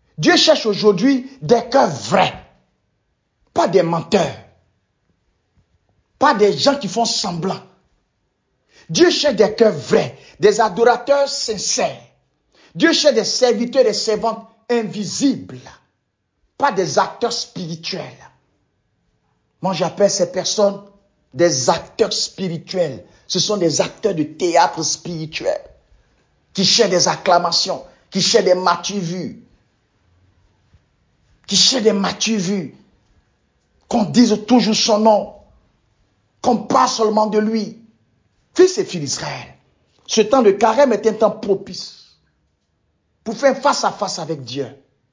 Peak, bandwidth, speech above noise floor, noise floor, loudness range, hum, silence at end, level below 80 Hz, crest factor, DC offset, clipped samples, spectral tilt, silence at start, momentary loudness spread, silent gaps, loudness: 0 dBFS; 7.6 kHz; 54 dB; -71 dBFS; 6 LU; none; 0.4 s; -58 dBFS; 18 dB; under 0.1%; under 0.1%; -3.5 dB/octave; 0.2 s; 13 LU; none; -17 LUFS